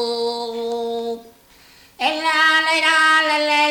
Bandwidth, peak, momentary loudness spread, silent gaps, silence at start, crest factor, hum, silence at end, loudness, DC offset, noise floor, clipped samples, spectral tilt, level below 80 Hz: 19 kHz; -4 dBFS; 12 LU; none; 0 s; 14 dB; none; 0 s; -17 LUFS; under 0.1%; -49 dBFS; under 0.1%; -0.5 dB/octave; -62 dBFS